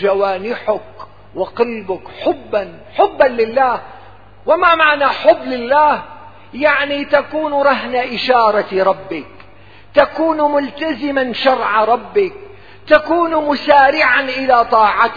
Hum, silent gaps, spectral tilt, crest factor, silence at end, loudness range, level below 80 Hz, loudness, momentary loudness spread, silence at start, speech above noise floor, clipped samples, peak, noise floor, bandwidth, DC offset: none; none; -6 dB/octave; 14 dB; 0 s; 4 LU; -50 dBFS; -14 LUFS; 11 LU; 0 s; 29 dB; under 0.1%; 0 dBFS; -43 dBFS; 5.4 kHz; 0.8%